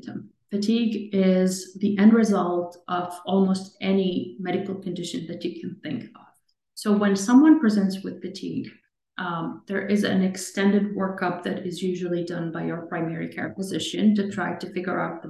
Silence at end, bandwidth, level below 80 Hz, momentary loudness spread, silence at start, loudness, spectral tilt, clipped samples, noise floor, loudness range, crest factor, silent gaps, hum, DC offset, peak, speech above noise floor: 0 s; 12.5 kHz; -70 dBFS; 14 LU; 0.05 s; -24 LUFS; -6 dB/octave; under 0.1%; -63 dBFS; 5 LU; 18 dB; none; none; under 0.1%; -6 dBFS; 40 dB